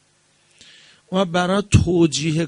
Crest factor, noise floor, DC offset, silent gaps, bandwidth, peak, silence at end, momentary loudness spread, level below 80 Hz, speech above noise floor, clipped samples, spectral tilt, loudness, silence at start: 20 dB; -60 dBFS; under 0.1%; none; 10.5 kHz; 0 dBFS; 0 s; 6 LU; -38 dBFS; 42 dB; under 0.1%; -5.5 dB/octave; -18 LUFS; 1.1 s